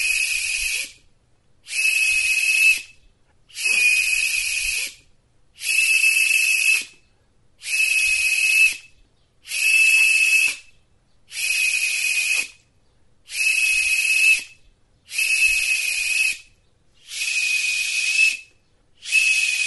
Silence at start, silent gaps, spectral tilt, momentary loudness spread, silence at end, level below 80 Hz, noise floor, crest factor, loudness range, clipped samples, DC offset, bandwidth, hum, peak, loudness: 0 s; none; 4 dB/octave; 14 LU; 0 s; -54 dBFS; -60 dBFS; 16 dB; 4 LU; under 0.1%; under 0.1%; 12 kHz; none; -6 dBFS; -17 LUFS